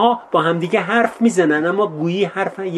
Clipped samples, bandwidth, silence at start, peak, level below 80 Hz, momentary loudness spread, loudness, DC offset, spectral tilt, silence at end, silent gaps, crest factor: under 0.1%; 12 kHz; 0 s; -2 dBFS; -68 dBFS; 4 LU; -17 LUFS; under 0.1%; -5.5 dB/octave; 0 s; none; 16 dB